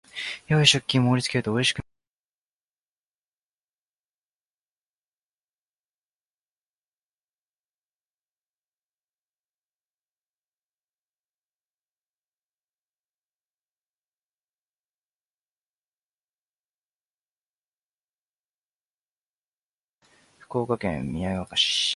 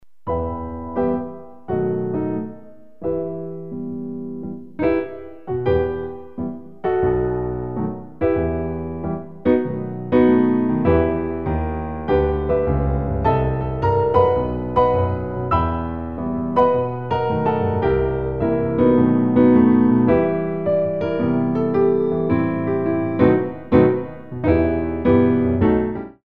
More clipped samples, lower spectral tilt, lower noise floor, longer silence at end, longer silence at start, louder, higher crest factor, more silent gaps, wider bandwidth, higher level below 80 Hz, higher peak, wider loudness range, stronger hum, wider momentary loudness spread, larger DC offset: neither; second, -4 dB/octave vs -11 dB/octave; first, under -90 dBFS vs -43 dBFS; about the same, 0 s vs 0.05 s; first, 0.15 s vs 0 s; second, -23 LUFS vs -20 LUFS; first, 30 dB vs 18 dB; first, 2.07-19.94 s vs none; first, 11.5 kHz vs 5 kHz; second, -58 dBFS vs -34 dBFS; about the same, -4 dBFS vs -2 dBFS; first, 12 LU vs 8 LU; first, 50 Hz at -80 dBFS vs none; about the same, 14 LU vs 13 LU; second, under 0.1% vs 0.9%